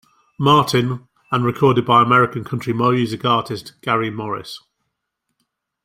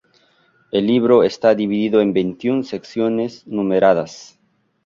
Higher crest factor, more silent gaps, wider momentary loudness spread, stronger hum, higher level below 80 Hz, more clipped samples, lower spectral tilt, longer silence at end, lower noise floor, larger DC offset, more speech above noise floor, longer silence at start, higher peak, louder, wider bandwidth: about the same, 18 dB vs 16 dB; neither; first, 14 LU vs 10 LU; neither; about the same, -56 dBFS vs -58 dBFS; neither; about the same, -6 dB/octave vs -6.5 dB/octave; first, 1.25 s vs 0.6 s; first, -76 dBFS vs -58 dBFS; neither; first, 59 dB vs 41 dB; second, 0.4 s vs 0.75 s; about the same, 0 dBFS vs -2 dBFS; about the same, -17 LUFS vs -17 LUFS; first, 16 kHz vs 7.4 kHz